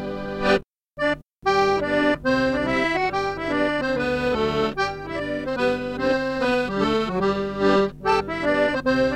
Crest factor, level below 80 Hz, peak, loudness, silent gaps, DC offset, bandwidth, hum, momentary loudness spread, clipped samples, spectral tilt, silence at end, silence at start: 16 dB; -44 dBFS; -6 dBFS; -22 LUFS; none; under 0.1%; 13 kHz; none; 5 LU; under 0.1%; -5.5 dB/octave; 0 s; 0 s